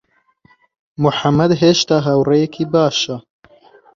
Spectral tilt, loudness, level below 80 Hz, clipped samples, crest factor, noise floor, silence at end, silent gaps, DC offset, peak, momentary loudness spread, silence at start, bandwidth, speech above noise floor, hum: -5.5 dB/octave; -15 LUFS; -52 dBFS; under 0.1%; 16 dB; -55 dBFS; 0.75 s; none; under 0.1%; -2 dBFS; 7 LU; 1 s; 7.6 kHz; 41 dB; none